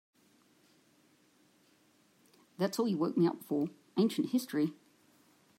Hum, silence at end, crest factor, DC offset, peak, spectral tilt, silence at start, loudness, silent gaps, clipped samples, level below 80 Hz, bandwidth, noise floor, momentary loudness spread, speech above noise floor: none; 0.85 s; 18 dB; under 0.1%; -18 dBFS; -6.5 dB/octave; 2.6 s; -33 LUFS; none; under 0.1%; -86 dBFS; 16 kHz; -68 dBFS; 6 LU; 36 dB